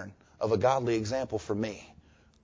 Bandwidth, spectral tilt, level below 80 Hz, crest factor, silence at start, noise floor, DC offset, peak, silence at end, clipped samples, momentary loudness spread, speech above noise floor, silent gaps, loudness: 7.8 kHz; -6 dB/octave; -56 dBFS; 18 dB; 0 s; -59 dBFS; under 0.1%; -12 dBFS; 0.5 s; under 0.1%; 13 LU; 30 dB; none; -30 LUFS